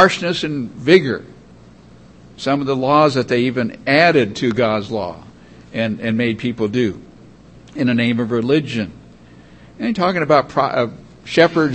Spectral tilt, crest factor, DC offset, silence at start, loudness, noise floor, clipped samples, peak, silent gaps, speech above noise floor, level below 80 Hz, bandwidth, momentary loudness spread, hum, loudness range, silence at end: -6 dB/octave; 18 dB; 0.1%; 0 s; -17 LUFS; -44 dBFS; under 0.1%; 0 dBFS; none; 27 dB; -52 dBFS; 8.8 kHz; 12 LU; none; 5 LU; 0 s